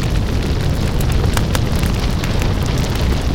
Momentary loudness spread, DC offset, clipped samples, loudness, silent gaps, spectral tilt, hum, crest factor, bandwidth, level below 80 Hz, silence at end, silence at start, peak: 2 LU; under 0.1%; under 0.1%; -18 LUFS; none; -5.5 dB/octave; none; 12 dB; 17 kHz; -20 dBFS; 0 s; 0 s; -4 dBFS